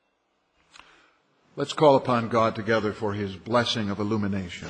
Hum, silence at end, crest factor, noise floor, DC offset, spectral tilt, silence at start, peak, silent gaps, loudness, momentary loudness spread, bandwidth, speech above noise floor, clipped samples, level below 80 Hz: none; 0 s; 22 dB; -72 dBFS; under 0.1%; -6 dB/octave; 1.55 s; -4 dBFS; none; -25 LUFS; 12 LU; 10 kHz; 47 dB; under 0.1%; -62 dBFS